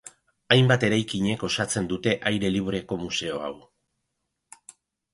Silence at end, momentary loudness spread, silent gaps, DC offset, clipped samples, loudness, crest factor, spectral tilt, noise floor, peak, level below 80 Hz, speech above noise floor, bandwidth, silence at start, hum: 1.55 s; 11 LU; none; under 0.1%; under 0.1%; -24 LUFS; 24 dB; -5 dB/octave; -79 dBFS; -2 dBFS; -54 dBFS; 55 dB; 11.5 kHz; 0.05 s; none